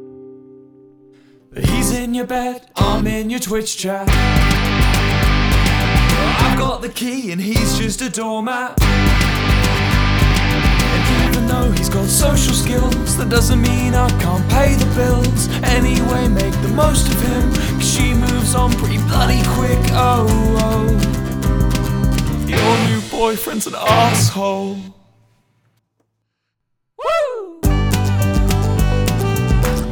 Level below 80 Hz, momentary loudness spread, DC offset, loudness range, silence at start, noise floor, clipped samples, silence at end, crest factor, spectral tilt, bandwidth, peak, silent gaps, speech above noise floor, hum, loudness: -20 dBFS; 6 LU; under 0.1%; 5 LU; 0 s; -73 dBFS; under 0.1%; 0 s; 16 dB; -5 dB/octave; over 20 kHz; 0 dBFS; none; 58 dB; none; -16 LUFS